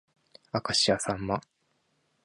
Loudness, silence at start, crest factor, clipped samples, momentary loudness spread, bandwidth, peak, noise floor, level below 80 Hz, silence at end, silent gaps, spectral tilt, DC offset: -28 LUFS; 0.55 s; 20 dB; under 0.1%; 10 LU; 11.5 kHz; -12 dBFS; -73 dBFS; -58 dBFS; 0.85 s; none; -3 dB/octave; under 0.1%